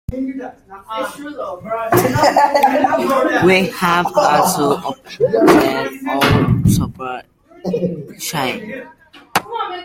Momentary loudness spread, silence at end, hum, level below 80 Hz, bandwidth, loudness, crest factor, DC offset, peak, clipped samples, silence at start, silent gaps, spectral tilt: 15 LU; 0 s; none; -40 dBFS; 16.5 kHz; -16 LUFS; 16 dB; under 0.1%; 0 dBFS; under 0.1%; 0.1 s; none; -5 dB/octave